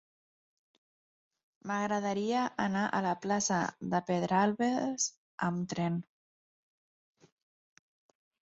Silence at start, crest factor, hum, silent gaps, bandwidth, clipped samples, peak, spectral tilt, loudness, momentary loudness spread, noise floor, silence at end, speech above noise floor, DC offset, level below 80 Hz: 1.65 s; 20 dB; none; 5.17-5.38 s; 8 kHz; under 0.1%; -14 dBFS; -5 dB/octave; -32 LUFS; 6 LU; under -90 dBFS; 2.55 s; over 58 dB; under 0.1%; -74 dBFS